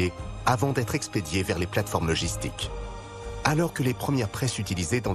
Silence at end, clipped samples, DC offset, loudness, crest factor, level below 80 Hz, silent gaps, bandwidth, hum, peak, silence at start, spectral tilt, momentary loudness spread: 0 s; under 0.1%; under 0.1%; -27 LUFS; 20 dB; -42 dBFS; none; 14 kHz; none; -8 dBFS; 0 s; -5 dB/octave; 9 LU